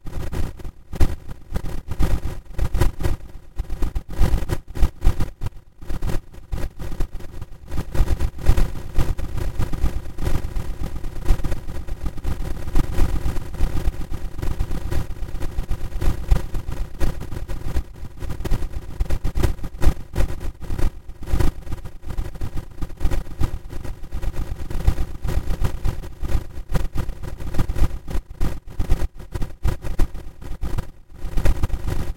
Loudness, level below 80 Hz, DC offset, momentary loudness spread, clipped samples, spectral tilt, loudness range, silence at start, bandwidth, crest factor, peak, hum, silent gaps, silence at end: -28 LUFS; -24 dBFS; under 0.1%; 10 LU; under 0.1%; -6.5 dB/octave; 3 LU; 0 s; 15.5 kHz; 20 dB; 0 dBFS; none; none; 0.05 s